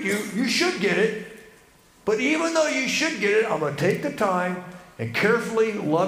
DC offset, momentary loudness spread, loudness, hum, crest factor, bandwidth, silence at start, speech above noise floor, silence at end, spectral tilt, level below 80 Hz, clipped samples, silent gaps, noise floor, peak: under 0.1%; 10 LU; -23 LUFS; none; 16 dB; 15.5 kHz; 0 s; 31 dB; 0 s; -4 dB/octave; -64 dBFS; under 0.1%; none; -54 dBFS; -8 dBFS